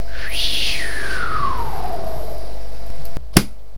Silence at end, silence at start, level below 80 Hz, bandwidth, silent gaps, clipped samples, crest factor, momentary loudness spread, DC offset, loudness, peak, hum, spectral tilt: 0 s; 0 s; -32 dBFS; 16 kHz; none; under 0.1%; 22 dB; 17 LU; 20%; -22 LUFS; 0 dBFS; none; -3.5 dB/octave